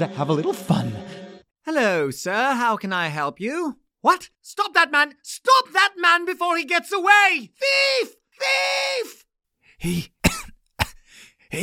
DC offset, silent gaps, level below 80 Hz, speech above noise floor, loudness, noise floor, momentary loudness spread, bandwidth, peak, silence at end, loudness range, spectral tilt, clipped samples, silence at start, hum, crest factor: under 0.1%; none; -46 dBFS; 40 dB; -20 LUFS; -61 dBFS; 14 LU; 18 kHz; -2 dBFS; 0 s; 6 LU; -3.5 dB/octave; under 0.1%; 0 s; none; 20 dB